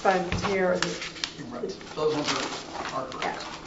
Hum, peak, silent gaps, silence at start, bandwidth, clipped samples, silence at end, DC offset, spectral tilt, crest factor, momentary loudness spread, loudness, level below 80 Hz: none; -6 dBFS; none; 0 s; 8 kHz; under 0.1%; 0 s; under 0.1%; -4 dB/octave; 22 dB; 10 LU; -29 LUFS; -50 dBFS